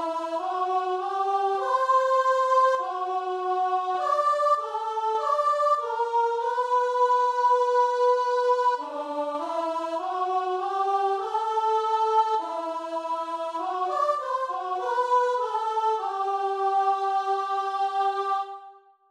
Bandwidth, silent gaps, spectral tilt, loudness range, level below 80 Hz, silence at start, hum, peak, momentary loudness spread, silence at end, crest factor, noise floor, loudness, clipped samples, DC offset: 11.5 kHz; none; -1.5 dB/octave; 4 LU; -78 dBFS; 0 s; none; -10 dBFS; 8 LU; 0.4 s; 14 dB; -50 dBFS; -25 LUFS; under 0.1%; under 0.1%